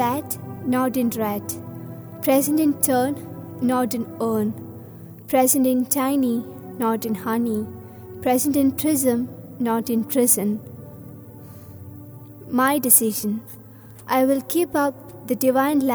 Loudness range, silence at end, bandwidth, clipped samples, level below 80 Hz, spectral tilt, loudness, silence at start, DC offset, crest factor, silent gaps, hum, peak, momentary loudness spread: 2 LU; 0 s; over 20 kHz; under 0.1%; -62 dBFS; -4.5 dB/octave; -21 LUFS; 0 s; under 0.1%; 22 dB; none; none; 0 dBFS; 22 LU